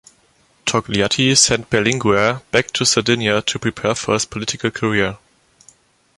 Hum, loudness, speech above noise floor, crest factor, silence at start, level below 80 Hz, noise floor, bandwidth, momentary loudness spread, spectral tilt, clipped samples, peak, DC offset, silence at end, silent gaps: none; -17 LUFS; 39 dB; 18 dB; 0.65 s; -48 dBFS; -57 dBFS; 11.5 kHz; 8 LU; -3 dB/octave; under 0.1%; 0 dBFS; under 0.1%; 1 s; none